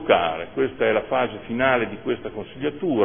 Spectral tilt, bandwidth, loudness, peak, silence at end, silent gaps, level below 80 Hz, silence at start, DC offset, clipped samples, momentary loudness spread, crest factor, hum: -9.5 dB/octave; 3.6 kHz; -23 LUFS; -2 dBFS; 0 s; none; -54 dBFS; 0 s; 0.4%; under 0.1%; 9 LU; 20 dB; none